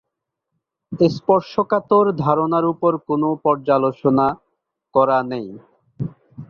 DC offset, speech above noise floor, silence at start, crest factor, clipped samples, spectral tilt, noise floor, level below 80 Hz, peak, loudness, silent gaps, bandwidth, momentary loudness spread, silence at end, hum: under 0.1%; 62 dB; 0.9 s; 18 dB; under 0.1%; -9 dB/octave; -80 dBFS; -58 dBFS; -2 dBFS; -18 LUFS; none; 6.8 kHz; 14 LU; 0.05 s; none